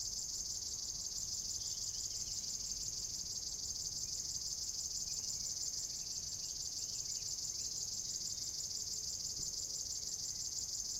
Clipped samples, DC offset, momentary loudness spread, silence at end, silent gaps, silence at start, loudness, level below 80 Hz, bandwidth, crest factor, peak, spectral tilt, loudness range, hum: under 0.1%; under 0.1%; 1 LU; 0 s; none; 0 s; -39 LUFS; -62 dBFS; 16 kHz; 16 dB; -26 dBFS; 0.5 dB/octave; 0 LU; none